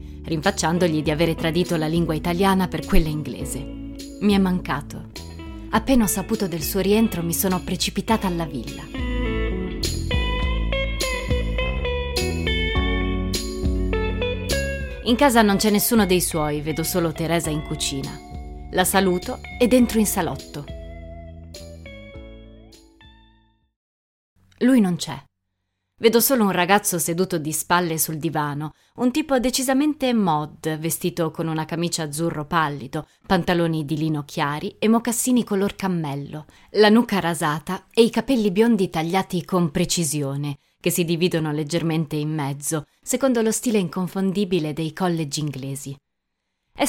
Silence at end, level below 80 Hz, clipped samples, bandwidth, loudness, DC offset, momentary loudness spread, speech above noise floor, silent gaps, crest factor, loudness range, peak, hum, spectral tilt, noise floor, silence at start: 0 s; -34 dBFS; under 0.1%; 16.5 kHz; -22 LUFS; under 0.1%; 14 LU; 57 dB; 23.76-24.36 s; 20 dB; 5 LU; -2 dBFS; none; -4.5 dB/octave; -78 dBFS; 0 s